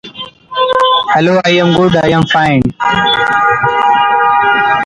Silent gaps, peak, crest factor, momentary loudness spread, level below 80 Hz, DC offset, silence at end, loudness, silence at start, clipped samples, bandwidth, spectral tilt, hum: none; 0 dBFS; 10 dB; 3 LU; -42 dBFS; under 0.1%; 0 s; -10 LUFS; 0.05 s; under 0.1%; 11 kHz; -5.5 dB/octave; none